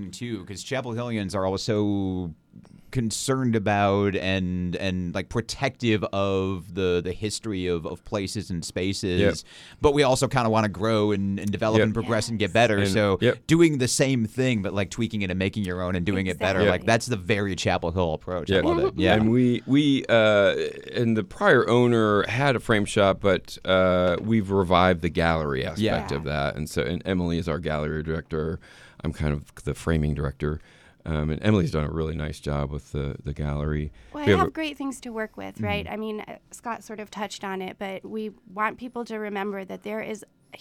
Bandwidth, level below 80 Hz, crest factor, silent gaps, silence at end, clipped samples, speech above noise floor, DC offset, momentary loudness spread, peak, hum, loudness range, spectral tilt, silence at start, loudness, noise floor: 15.5 kHz; -42 dBFS; 18 dB; none; 0.05 s; under 0.1%; 23 dB; under 0.1%; 13 LU; -6 dBFS; none; 8 LU; -5.5 dB/octave; 0 s; -25 LUFS; -47 dBFS